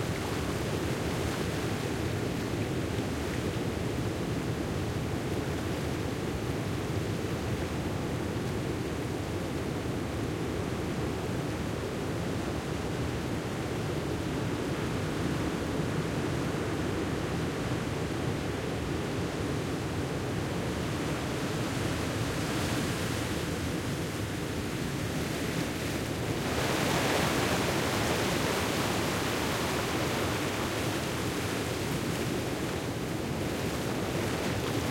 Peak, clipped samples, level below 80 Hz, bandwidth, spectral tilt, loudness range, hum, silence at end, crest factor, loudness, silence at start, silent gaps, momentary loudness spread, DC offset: -16 dBFS; under 0.1%; -48 dBFS; 16.5 kHz; -5 dB/octave; 4 LU; none; 0 s; 16 dB; -32 LUFS; 0 s; none; 5 LU; under 0.1%